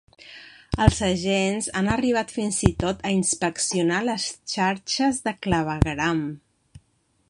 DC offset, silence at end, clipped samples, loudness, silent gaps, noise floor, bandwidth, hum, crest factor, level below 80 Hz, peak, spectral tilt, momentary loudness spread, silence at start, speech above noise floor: under 0.1%; 0.5 s; under 0.1%; -23 LUFS; none; -66 dBFS; 11.5 kHz; none; 22 dB; -38 dBFS; -2 dBFS; -4.5 dB/octave; 10 LU; 0.2 s; 43 dB